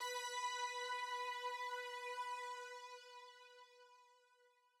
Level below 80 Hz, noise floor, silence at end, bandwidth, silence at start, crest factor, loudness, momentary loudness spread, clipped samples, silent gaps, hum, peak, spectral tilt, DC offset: under -90 dBFS; -74 dBFS; 0.3 s; 16 kHz; 0 s; 14 dB; -45 LUFS; 19 LU; under 0.1%; none; none; -34 dBFS; 6 dB/octave; under 0.1%